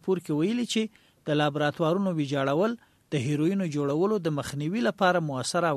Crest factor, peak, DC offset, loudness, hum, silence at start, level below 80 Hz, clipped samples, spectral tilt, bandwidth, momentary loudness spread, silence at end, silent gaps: 18 dB; -10 dBFS; under 0.1%; -27 LUFS; none; 0.05 s; -66 dBFS; under 0.1%; -5.5 dB/octave; 13.5 kHz; 6 LU; 0 s; none